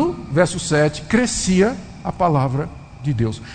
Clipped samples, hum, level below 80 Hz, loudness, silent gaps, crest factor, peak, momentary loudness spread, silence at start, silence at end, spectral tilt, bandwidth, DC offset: under 0.1%; none; -40 dBFS; -19 LUFS; none; 18 dB; -2 dBFS; 11 LU; 0 s; 0 s; -5.5 dB/octave; 9.4 kHz; under 0.1%